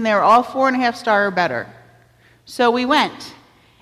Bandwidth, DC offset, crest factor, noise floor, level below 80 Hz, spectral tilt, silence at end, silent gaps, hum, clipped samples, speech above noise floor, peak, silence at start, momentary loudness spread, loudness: 14.5 kHz; under 0.1%; 16 dB; -52 dBFS; -60 dBFS; -4.5 dB/octave; 0.5 s; none; none; under 0.1%; 36 dB; -4 dBFS; 0 s; 21 LU; -17 LUFS